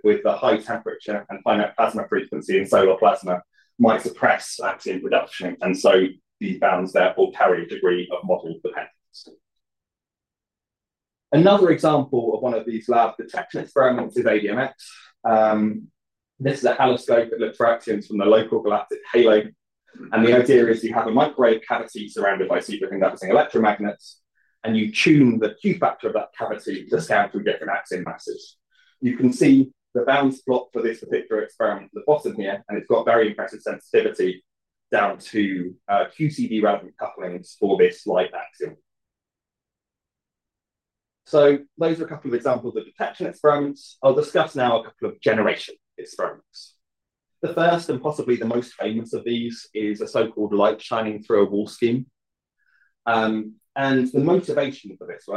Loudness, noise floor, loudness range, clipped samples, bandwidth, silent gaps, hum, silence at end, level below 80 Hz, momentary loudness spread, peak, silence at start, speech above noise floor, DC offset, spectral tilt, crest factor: -21 LUFS; -89 dBFS; 6 LU; under 0.1%; 12.5 kHz; none; none; 0 s; -70 dBFS; 13 LU; -4 dBFS; 0.05 s; 68 dB; under 0.1%; -6 dB/octave; 18 dB